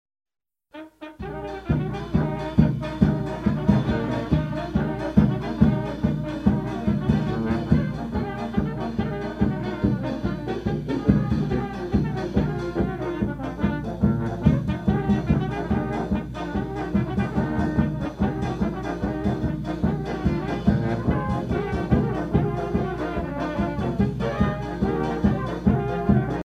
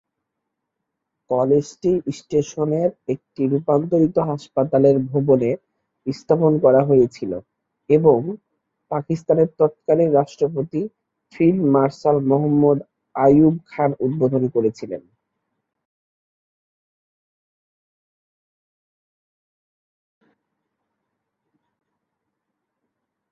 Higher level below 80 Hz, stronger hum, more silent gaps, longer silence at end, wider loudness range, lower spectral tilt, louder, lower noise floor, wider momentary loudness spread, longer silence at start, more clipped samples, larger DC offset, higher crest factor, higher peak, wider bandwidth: first, -36 dBFS vs -60 dBFS; neither; neither; second, 0.05 s vs 8.35 s; about the same, 3 LU vs 5 LU; about the same, -9 dB/octave vs -9 dB/octave; second, -25 LUFS vs -19 LUFS; second, -44 dBFS vs -80 dBFS; second, 6 LU vs 14 LU; second, 0.75 s vs 1.3 s; neither; neither; about the same, 20 dB vs 18 dB; about the same, -4 dBFS vs -2 dBFS; about the same, 8.4 kHz vs 7.8 kHz